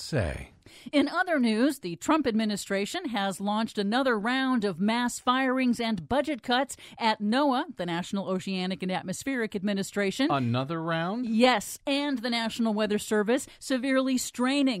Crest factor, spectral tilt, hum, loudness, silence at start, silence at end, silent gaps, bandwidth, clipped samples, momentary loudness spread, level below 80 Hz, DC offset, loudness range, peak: 18 dB; -4.5 dB/octave; none; -27 LUFS; 0 s; 0 s; none; 16 kHz; under 0.1%; 6 LU; -56 dBFS; under 0.1%; 2 LU; -8 dBFS